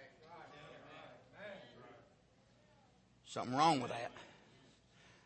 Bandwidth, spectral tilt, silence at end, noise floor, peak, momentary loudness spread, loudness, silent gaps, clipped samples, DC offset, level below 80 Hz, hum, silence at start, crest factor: 8.4 kHz; -4.5 dB/octave; 0.95 s; -69 dBFS; -20 dBFS; 25 LU; -38 LUFS; none; under 0.1%; under 0.1%; -80 dBFS; none; 0 s; 24 dB